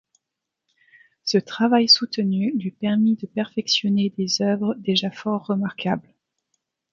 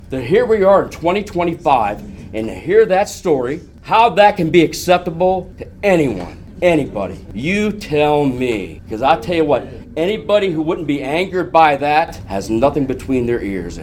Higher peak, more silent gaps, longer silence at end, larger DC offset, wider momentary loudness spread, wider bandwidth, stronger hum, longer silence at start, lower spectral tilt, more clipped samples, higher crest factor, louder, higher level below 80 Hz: second, -4 dBFS vs 0 dBFS; neither; first, 0.9 s vs 0 s; neither; about the same, 11 LU vs 12 LU; second, 7.4 kHz vs 17.5 kHz; neither; first, 1.25 s vs 0 s; second, -4.5 dB/octave vs -6 dB/octave; neither; about the same, 20 dB vs 16 dB; second, -21 LUFS vs -16 LUFS; second, -68 dBFS vs -40 dBFS